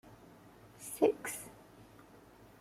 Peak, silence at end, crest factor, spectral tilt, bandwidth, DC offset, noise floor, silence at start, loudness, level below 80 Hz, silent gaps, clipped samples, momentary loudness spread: -16 dBFS; 0.75 s; 24 dB; -4 dB/octave; 16.5 kHz; under 0.1%; -59 dBFS; 0.05 s; -35 LUFS; -72 dBFS; none; under 0.1%; 27 LU